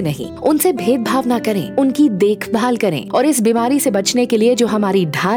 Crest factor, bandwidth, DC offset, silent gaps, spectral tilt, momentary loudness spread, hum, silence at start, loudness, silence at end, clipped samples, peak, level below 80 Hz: 12 dB; over 20 kHz; under 0.1%; none; -5 dB/octave; 4 LU; none; 0 s; -15 LUFS; 0 s; under 0.1%; -4 dBFS; -58 dBFS